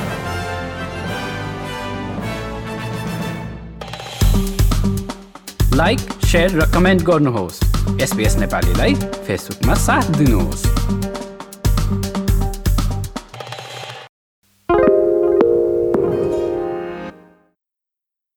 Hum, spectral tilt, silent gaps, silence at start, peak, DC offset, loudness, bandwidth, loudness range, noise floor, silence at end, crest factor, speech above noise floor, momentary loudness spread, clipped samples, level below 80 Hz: none; -5.5 dB/octave; 14.09-14.42 s; 0 s; -2 dBFS; under 0.1%; -18 LUFS; 19 kHz; 7 LU; -83 dBFS; 1.25 s; 16 dB; 68 dB; 16 LU; under 0.1%; -24 dBFS